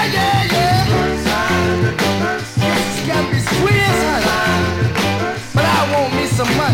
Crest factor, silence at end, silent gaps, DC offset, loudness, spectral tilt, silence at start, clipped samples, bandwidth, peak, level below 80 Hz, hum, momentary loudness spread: 12 dB; 0 s; none; under 0.1%; -16 LUFS; -5 dB/octave; 0 s; under 0.1%; 17 kHz; -4 dBFS; -34 dBFS; none; 4 LU